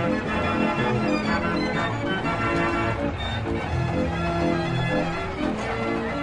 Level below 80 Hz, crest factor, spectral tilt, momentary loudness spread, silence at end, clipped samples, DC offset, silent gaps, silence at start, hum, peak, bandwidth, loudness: -40 dBFS; 14 dB; -6.5 dB/octave; 4 LU; 0 s; under 0.1%; under 0.1%; none; 0 s; none; -10 dBFS; 11 kHz; -25 LUFS